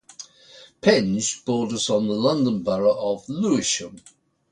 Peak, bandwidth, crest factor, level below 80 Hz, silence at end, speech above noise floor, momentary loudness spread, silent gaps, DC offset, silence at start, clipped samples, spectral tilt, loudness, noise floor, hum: -4 dBFS; 11 kHz; 20 dB; -60 dBFS; 0.55 s; 28 dB; 13 LU; none; under 0.1%; 0.2 s; under 0.1%; -4 dB/octave; -22 LUFS; -49 dBFS; none